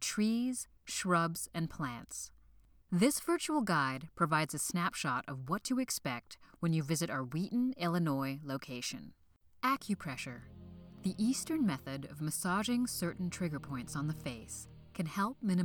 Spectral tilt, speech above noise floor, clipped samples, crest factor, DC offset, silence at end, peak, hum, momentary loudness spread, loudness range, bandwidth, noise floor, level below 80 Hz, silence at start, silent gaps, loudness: -4.5 dB/octave; 28 dB; under 0.1%; 20 dB; under 0.1%; 0 s; -16 dBFS; none; 12 LU; 4 LU; 19.5 kHz; -63 dBFS; -64 dBFS; 0 s; none; -36 LUFS